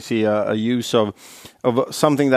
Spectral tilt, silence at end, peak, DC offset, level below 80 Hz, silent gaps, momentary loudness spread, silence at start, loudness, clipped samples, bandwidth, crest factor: -5.5 dB/octave; 0 s; 0 dBFS; under 0.1%; -64 dBFS; none; 8 LU; 0 s; -20 LUFS; under 0.1%; 15.5 kHz; 18 dB